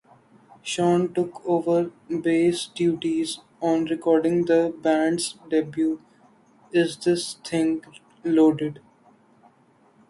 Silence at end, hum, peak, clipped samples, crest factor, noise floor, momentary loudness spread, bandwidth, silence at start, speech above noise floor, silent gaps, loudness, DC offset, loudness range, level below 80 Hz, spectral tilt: 1.3 s; none; -8 dBFS; under 0.1%; 16 dB; -59 dBFS; 9 LU; 11.5 kHz; 0.65 s; 36 dB; none; -23 LUFS; under 0.1%; 2 LU; -68 dBFS; -5.5 dB/octave